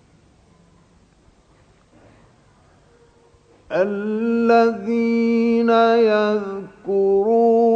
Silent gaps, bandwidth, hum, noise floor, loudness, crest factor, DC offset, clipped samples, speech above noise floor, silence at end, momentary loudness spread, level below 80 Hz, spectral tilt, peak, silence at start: none; 7 kHz; none; -54 dBFS; -18 LUFS; 16 dB; under 0.1%; under 0.1%; 38 dB; 0 s; 9 LU; -60 dBFS; -7 dB/octave; -4 dBFS; 3.7 s